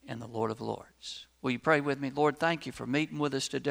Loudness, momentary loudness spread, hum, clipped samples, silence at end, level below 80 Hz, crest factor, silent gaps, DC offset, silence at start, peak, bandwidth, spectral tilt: -31 LUFS; 13 LU; none; under 0.1%; 0 s; -66 dBFS; 22 dB; none; under 0.1%; 0.05 s; -10 dBFS; over 20 kHz; -5 dB/octave